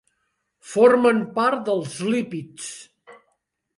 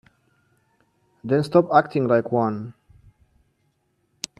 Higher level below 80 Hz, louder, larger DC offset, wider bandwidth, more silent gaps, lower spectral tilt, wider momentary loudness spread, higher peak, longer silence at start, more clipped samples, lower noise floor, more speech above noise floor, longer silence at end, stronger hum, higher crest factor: second, -70 dBFS vs -64 dBFS; about the same, -20 LUFS vs -21 LUFS; neither; about the same, 11.5 kHz vs 12 kHz; neither; second, -5 dB/octave vs -6.5 dB/octave; about the same, 19 LU vs 19 LU; about the same, -4 dBFS vs -2 dBFS; second, 0.65 s vs 1.25 s; neither; first, -74 dBFS vs -69 dBFS; first, 53 dB vs 49 dB; second, 0.65 s vs 1.7 s; neither; second, 18 dB vs 24 dB